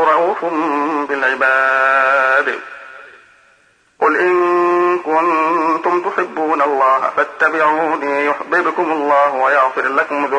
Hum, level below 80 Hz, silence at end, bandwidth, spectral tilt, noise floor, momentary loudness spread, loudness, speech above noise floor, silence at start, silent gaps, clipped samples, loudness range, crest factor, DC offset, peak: none; -68 dBFS; 0 s; 10 kHz; -4.5 dB/octave; -54 dBFS; 6 LU; -15 LUFS; 39 dB; 0 s; none; under 0.1%; 2 LU; 14 dB; under 0.1%; -2 dBFS